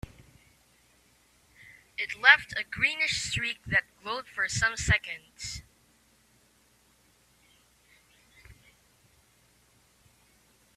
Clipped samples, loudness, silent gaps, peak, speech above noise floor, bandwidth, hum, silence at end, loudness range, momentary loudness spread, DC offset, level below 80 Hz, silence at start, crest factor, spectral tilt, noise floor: under 0.1%; -26 LUFS; none; -4 dBFS; 37 dB; 14.5 kHz; none; 2.25 s; 10 LU; 19 LU; under 0.1%; -52 dBFS; 2 s; 30 dB; -2 dB/octave; -65 dBFS